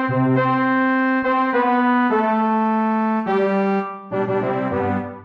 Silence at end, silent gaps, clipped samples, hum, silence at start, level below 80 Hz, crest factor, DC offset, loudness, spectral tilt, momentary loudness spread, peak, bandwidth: 0 s; none; under 0.1%; none; 0 s; -58 dBFS; 12 dB; under 0.1%; -19 LUFS; -9 dB/octave; 5 LU; -8 dBFS; 5.6 kHz